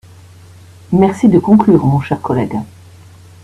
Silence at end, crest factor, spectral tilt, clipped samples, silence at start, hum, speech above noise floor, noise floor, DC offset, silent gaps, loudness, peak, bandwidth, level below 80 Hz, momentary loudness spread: 0.8 s; 14 dB; -9 dB/octave; under 0.1%; 0.9 s; none; 28 dB; -39 dBFS; under 0.1%; none; -12 LUFS; 0 dBFS; 11 kHz; -46 dBFS; 12 LU